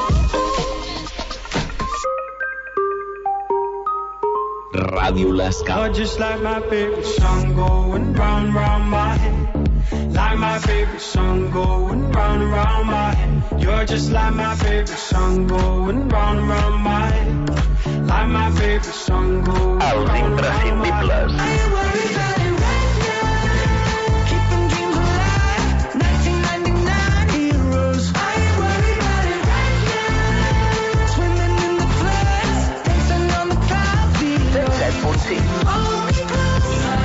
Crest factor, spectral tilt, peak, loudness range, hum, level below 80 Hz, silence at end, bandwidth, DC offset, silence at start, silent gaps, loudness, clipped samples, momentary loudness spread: 10 dB; -6 dB/octave; -6 dBFS; 2 LU; none; -22 dBFS; 0 s; 8 kHz; under 0.1%; 0 s; none; -19 LUFS; under 0.1%; 4 LU